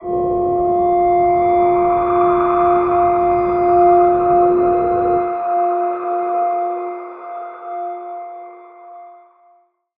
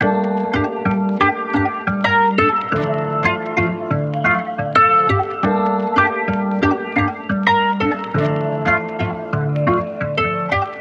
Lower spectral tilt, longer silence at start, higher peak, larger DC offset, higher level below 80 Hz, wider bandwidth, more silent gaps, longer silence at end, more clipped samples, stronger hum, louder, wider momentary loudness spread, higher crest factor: first, -11 dB/octave vs -7.5 dB/octave; about the same, 0 s vs 0 s; about the same, -2 dBFS vs 0 dBFS; neither; about the same, -44 dBFS vs -46 dBFS; second, 3.7 kHz vs 8 kHz; neither; first, 0.85 s vs 0 s; neither; neither; first, -15 LUFS vs -18 LUFS; first, 16 LU vs 5 LU; about the same, 14 dB vs 18 dB